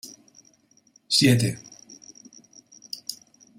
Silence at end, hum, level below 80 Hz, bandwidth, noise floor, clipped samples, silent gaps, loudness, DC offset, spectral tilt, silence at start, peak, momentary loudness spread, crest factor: 0.45 s; none; -62 dBFS; 16 kHz; -61 dBFS; under 0.1%; none; -22 LUFS; under 0.1%; -4 dB/octave; 0.05 s; -6 dBFS; 27 LU; 22 dB